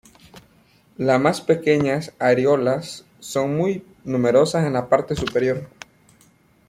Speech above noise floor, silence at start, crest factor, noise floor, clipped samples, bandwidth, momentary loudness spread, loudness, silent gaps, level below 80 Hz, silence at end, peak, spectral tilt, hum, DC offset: 37 dB; 0.35 s; 18 dB; -56 dBFS; under 0.1%; 15.5 kHz; 10 LU; -20 LUFS; none; -54 dBFS; 1 s; -2 dBFS; -6 dB/octave; none; under 0.1%